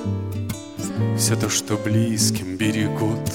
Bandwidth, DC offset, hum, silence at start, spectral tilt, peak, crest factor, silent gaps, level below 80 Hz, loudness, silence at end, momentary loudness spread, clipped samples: 17 kHz; 0.2%; none; 0 s; -4.5 dB/octave; -6 dBFS; 16 dB; none; -52 dBFS; -22 LUFS; 0 s; 10 LU; under 0.1%